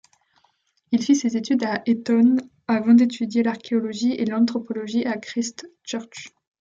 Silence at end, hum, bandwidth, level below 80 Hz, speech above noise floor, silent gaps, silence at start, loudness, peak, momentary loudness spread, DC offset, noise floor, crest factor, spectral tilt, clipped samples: 0.4 s; none; 7.6 kHz; -70 dBFS; 45 dB; none; 0.9 s; -22 LUFS; -6 dBFS; 15 LU; under 0.1%; -66 dBFS; 16 dB; -5 dB/octave; under 0.1%